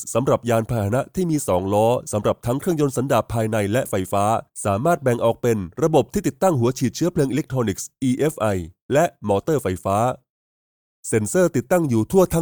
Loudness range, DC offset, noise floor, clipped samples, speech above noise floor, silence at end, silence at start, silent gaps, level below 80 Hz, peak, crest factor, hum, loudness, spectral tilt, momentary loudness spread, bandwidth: 2 LU; under 0.1%; under -90 dBFS; under 0.1%; over 70 dB; 0 s; 0 s; 8.82-8.89 s, 10.30-11.03 s; -48 dBFS; -4 dBFS; 16 dB; none; -21 LUFS; -6 dB/octave; 5 LU; over 20 kHz